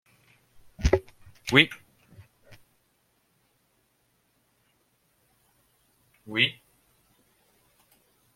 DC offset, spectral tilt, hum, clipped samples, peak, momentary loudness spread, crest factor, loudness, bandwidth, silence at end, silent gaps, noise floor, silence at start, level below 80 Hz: under 0.1%; -4.5 dB/octave; none; under 0.1%; -2 dBFS; 15 LU; 30 dB; -24 LUFS; 16.5 kHz; 1.85 s; none; -70 dBFS; 0.8 s; -42 dBFS